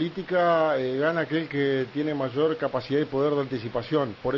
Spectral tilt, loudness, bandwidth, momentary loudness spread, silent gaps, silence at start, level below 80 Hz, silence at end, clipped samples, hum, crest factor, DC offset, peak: -8 dB/octave; -26 LUFS; 7 kHz; 6 LU; none; 0 s; -58 dBFS; 0 s; under 0.1%; none; 14 dB; under 0.1%; -12 dBFS